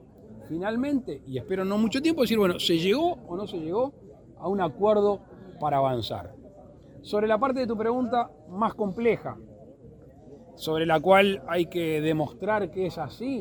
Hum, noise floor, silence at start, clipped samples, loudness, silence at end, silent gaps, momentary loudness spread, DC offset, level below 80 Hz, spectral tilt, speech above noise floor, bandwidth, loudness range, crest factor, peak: none; -49 dBFS; 0.2 s; under 0.1%; -26 LUFS; 0 s; none; 12 LU; under 0.1%; -56 dBFS; -6 dB/octave; 24 dB; 19 kHz; 3 LU; 22 dB; -6 dBFS